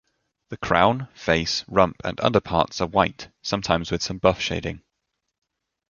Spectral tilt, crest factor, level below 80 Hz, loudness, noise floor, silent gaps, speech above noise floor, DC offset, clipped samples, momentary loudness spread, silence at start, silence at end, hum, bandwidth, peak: -4.5 dB/octave; 24 dB; -44 dBFS; -23 LUFS; -79 dBFS; none; 56 dB; under 0.1%; under 0.1%; 12 LU; 0.5 s; 1.1 s; none; 7.4 kHz; 0 dBFS